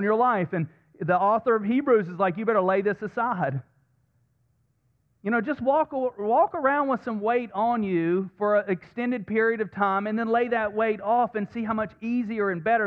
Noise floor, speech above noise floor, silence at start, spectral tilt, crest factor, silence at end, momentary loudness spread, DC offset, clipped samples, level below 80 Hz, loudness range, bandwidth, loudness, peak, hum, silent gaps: -69 dBFS; 45 dB; 0 s; -9.5 dB/octave; 16 dB; 0 s; 7 LU; under 0.1%; under 0.1%; -66 dBFS; 4 LU; 5.6 kHz; -25 LUFS; -10 dBFS; none; none